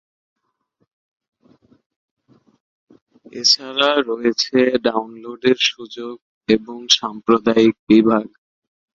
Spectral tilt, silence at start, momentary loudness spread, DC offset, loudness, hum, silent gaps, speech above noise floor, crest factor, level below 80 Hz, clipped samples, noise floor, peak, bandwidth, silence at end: -3.5 dB/octave; 3.35 s; 18 LU; under 0.1%; -17 LUFS; none; 6.22-6.41 s, 7.79-7.87 s; 51 dB; 20 dB; -60 dBFS; under 0.1%; -69 dBFS; 0 dBFS; 7.8 kHz; 0.75 s